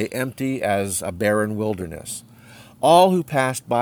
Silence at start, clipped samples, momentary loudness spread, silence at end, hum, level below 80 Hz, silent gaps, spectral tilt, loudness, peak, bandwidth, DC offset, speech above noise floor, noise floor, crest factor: 0 s; under 0.1%; 16 LU; 0 s; none; -54 dBFS; none; -4.5 dB/octave; -20 LUFS; -2 dBFS; over 20 kHz; under 0.1%; 25 dB; -46 dBFS; 18 dB